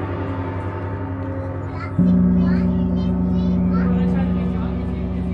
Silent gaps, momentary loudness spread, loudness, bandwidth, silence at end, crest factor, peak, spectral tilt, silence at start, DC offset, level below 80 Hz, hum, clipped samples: none; 10 LU; -21 LUFS; 4.9 kHz; 0 s; 14 dB; -4 dBFS; -10.5 dB/octave; 0 s; under 0.1%; -30 dBFS; none; under 0.1%